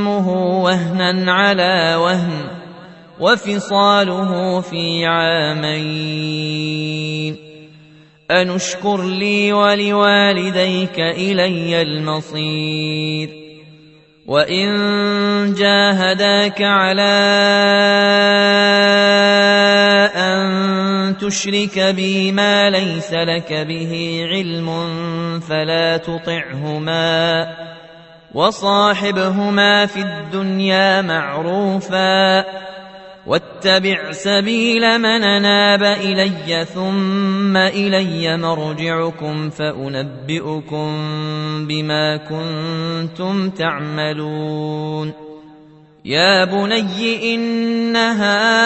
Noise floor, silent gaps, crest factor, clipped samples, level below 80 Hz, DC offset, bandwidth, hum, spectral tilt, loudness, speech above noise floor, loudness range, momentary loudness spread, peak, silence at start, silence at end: -46 dBFS; none; 16 dB; under 0.1%; -58 dBFS; under 0.1%; 8.4 kHz; none; -4.5 dB/octave; -15 LUFS; 30 dB; 8 LU; 11 LU; 0 dBFS; 0 s; 0 s